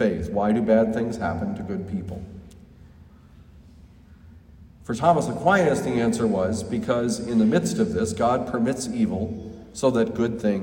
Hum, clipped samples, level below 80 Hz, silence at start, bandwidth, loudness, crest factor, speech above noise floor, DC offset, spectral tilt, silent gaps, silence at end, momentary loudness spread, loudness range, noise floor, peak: none; under 0.1%; -50 dBFS; 0 s; 16 kHz; -23 LUFS; 18 dB; 26 dB; under 0.1%; -6 dB/octave; none; 0 s; 12 LU; 12 LU; -49 dBFS; -6 dBFS